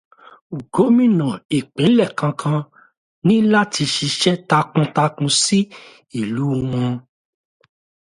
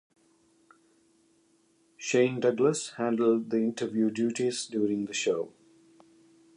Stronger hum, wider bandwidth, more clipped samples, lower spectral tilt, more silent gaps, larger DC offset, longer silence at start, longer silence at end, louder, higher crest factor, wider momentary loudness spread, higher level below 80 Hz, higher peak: neither; about the same, 11.5 kHz vs 11 kHz; neither; about the same, -5 dB/octave vs -4.5 dB/octave; first, 1.45-1.49 s, 2.97-3.22 s vs none; neither; second, 0.5 s vs 2 s; about the same, 1.1 s vs 1.1 s; first, -18 LUFS vs -28 LUFS; about the same, 18 dB vs 18 dB; first, 11 LU vs 5 LU; first, -56 dBFS vs -78 dBFS; first, 0 dBFS vs -12 dBFS